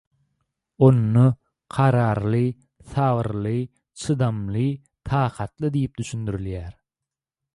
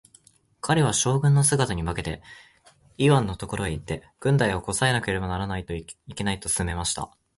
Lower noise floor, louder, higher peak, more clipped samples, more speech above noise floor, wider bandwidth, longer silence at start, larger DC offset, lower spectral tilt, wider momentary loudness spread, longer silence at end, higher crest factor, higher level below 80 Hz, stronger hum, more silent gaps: first, -88 dBFS vs -58 dBFS; about the same, -23 LUFS vs -24 LUFS; about the same, -4 dBFS vs -6 dBFS; neither; first, 67 dB vs 34 dB; about the same, 11 kHz vs 11.5 kHz; first, 0.8 s vs 0.65 s; neither; first, -8 dB/octave vs -4.5 dB/octave; about the same, 16 LU vs 14 LU; first, 0.85 s vs 0.3 s; about the same, 18 dB vs 20 dB; about the same, -46 dBFS vs -42 dBFS; neither; neither